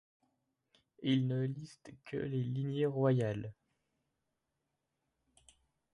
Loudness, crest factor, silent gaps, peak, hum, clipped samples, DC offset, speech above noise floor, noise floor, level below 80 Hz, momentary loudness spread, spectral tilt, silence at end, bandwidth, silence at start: -35 LUFS; 18 dB; none; -20 dBFS; none; under 0.1%; under 0.1%; 51 dB; -86 dBFS; -72 dBFS; 16 LU; -8 dB/octave; 2.4 s; 11 kHz; 1 s